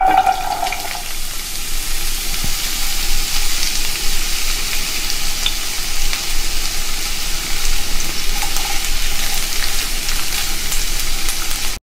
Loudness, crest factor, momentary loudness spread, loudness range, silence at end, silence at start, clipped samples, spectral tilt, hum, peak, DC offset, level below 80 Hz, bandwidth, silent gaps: -19 LUFS; 14 dB; 3 LU; 1 LU; 0.1 s; 0 s; under 0.1%; -0.5 dB/octave; none; 0 dBFS; under 0.1%; -20 dBFS; 16.5 kHz; none